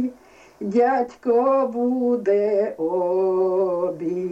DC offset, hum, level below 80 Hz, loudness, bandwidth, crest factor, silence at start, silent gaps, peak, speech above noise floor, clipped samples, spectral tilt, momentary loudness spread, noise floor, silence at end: under 0.1%; none; -66 dBFS; -21 LUFS; 7.8 kHz; 12 dB; 0 s; none; -8 dBFS; 27 dB; under 0.1%; -8 dB/octave; 6 LU; -48 dBFS; 0 s